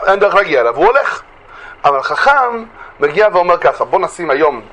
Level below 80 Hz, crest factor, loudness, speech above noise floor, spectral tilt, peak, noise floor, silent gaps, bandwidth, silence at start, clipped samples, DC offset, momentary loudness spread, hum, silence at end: -46 dBFS; 12 dB; -12 LUFS; 23 dB; -4.5 dB/octave; 0 dBFS; -35 dBFS; none; 11 kHz; 0 s; under 0.1%; under 0.1%; 7 LU; none; 0.05 s